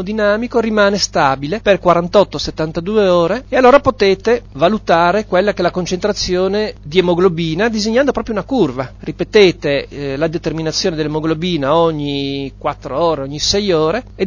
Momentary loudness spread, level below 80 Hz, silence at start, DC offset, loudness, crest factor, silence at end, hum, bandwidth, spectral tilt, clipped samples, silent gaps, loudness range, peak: 8 LU; -38 dBFS; 0 s; under 0.1%; -15 LUFS; 14 dB; 0 s; 50 Hz at -40 dBFS; 7.2 kHz; -5 dB/octave; under 0.1%; none; 4 LU; 0 dBFS